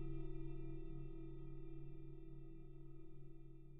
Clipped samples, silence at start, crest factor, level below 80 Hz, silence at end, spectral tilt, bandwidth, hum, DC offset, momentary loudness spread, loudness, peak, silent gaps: under 0.1%; 0 s; 12 dB; -52 dBFS; 0 s; -10 dB/octave; 3.8 kHz; none; under 0.1%; 9 LU; -56 LUFS; -36 dBFS; none